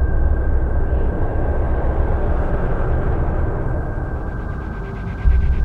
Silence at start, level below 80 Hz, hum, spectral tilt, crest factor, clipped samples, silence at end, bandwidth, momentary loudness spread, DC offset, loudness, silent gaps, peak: 0 s; -18 dBFS; none; -10 dB/octave; 14 dB; under 0.1%; 0 s; 3.5 kHz; 7 LU; under 0.1%; -22 LUFS; none; -2 dBFS